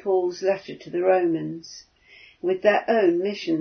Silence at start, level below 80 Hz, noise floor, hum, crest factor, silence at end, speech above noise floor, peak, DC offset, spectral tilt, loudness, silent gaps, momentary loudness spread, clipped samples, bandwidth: 0.05 s; -70 dBFS; -52 dBFS; none; 18 dB; 0 s; 29 dB; -4 dBFS; under 0.1%; -5.5 dB/octave; -23 LUFS; none; 14 LU; under 0.1%; 6.6 kHz